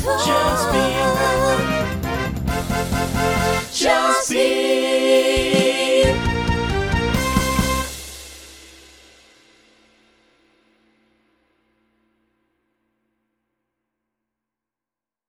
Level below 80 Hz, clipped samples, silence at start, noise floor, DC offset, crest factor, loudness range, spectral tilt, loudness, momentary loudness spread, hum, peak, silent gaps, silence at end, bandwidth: -34 dBFS; under 0.1%; 0 s; -90 dBFS; under 0.1%; 20 dB; 8 LU; -4 dB/octave; -18 LUFS; 8 LU; none; -2 dBFS; none; 6.65 s; over 20 kHz